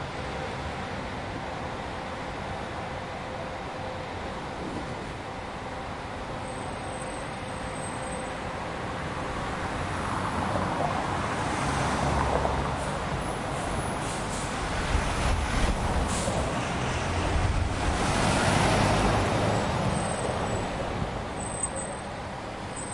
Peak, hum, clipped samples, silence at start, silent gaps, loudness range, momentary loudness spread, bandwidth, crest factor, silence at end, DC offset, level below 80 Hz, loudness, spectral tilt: -10 dBFS; none; under 0.1%; 0 s; none; 9 LU; 10 LU; 11.5 kHz; 18 dB; 0 s; under 0.1%; -38 dBFS; -30 LUFS; -4.5 dB/octave